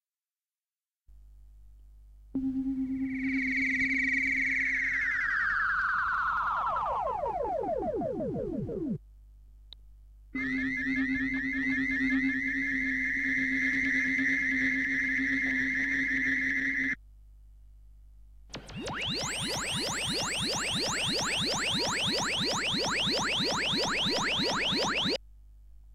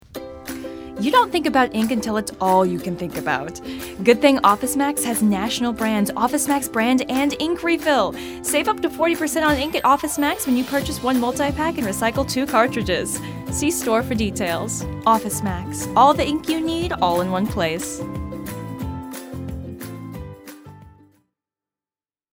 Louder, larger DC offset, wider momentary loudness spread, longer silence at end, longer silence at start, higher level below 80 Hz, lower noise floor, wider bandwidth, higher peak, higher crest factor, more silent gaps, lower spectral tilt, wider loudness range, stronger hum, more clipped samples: second, -28 LUFS vs -20 LUFS; neither; second, 7 LU vs 15 LU; second, 0 s vs 1.45 s; first, 1.1 s vs 0.15 s; second, -52 dBFS vs -42 dBFS; about the same, under -90 dBFS vs under -90 dBFS; second, 16 kHz vs 19.5 kHz; second, -18 dBFS vs 0 dBFS; second, 12 dB vs 20 dB; neither; second, -2.5 dB/octave vs -4 dB/octave; about the same, 7 LU vs 9 LU; first, 50 Hz at -55 dBFS vs none; neither